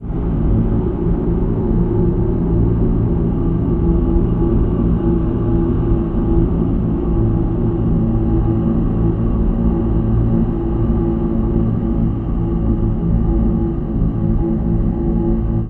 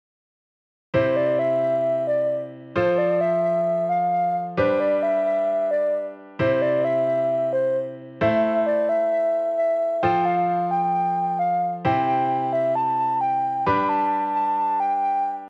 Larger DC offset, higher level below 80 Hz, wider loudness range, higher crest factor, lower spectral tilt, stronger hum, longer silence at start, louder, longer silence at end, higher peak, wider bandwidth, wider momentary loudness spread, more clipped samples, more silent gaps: neither; first, -20 dBFS vs -58 dBFS; about the same, 1 LU vs 1 LU; about the same, 14 dB vs 14 dB; first, -13 dB/octave vs -8 dB/octave; neither; second, 0 s vs 0.95 s; first, -17 LUFS vs -22 LUFS; about the same, 0 s vs 0 s; first, -2 dBFS vs -8 dBFS; second, 3.3 kHz vs 7.4 kHz; about the same, 2 LU vs 3 LU; neither; neither